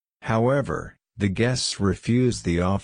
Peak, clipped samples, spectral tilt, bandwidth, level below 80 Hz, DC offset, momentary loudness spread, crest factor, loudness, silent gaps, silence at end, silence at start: -8 dBFS; under 0.1%; -5.5 dB/octave; 10.5 kHz; -44 dBFS; under 0.1%; 8 LU; 16 dB; -24 LUFS; none; 0 s; 0.2 s